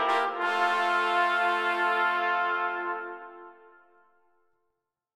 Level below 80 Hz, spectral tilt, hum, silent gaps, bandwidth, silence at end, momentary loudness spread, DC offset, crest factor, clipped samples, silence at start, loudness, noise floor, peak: -82 dBFS; -2 dB/octave; none; none; 15.5 kHz; 1.65 s; 11 LU; under 0.1%; 16 dB; under 0.1%; 0 s; -26 LUFS; -82 dBFS; -12 dBFS